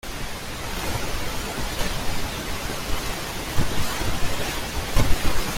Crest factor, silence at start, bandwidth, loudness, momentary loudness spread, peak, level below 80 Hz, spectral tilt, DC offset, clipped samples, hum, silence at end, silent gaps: 18 dB; 0.05 s; 16.5 kHz; -28 LUFS; 5 LU; -4 dBFS; -30 dBFS; -3.5 dB/octave; under 0.1%; under 0.1%; none; 0 s; none